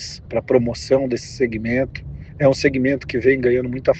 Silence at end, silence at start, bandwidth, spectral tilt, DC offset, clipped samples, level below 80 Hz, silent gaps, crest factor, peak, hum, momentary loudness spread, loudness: 0 s; 0 s; 8.6 kHz; -6 dB/octave; under 0.1%; under 0.1%; -42 dBFS; none; 18 dB; -2 dBFS; none; 9 LU; -19 LUFS